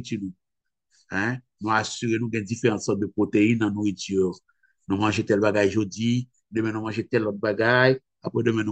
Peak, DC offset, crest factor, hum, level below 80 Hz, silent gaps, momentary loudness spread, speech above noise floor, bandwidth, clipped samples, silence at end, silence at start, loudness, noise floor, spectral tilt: -4 dBFS; under 0.1%; 20 dB; none; -64 dBFS; none; 10 LU; 58 dB; 8.8 kHz; under 0.1%; 0 s; 0 s; -24 LUFS; -82 dBFS; -6 dB/octave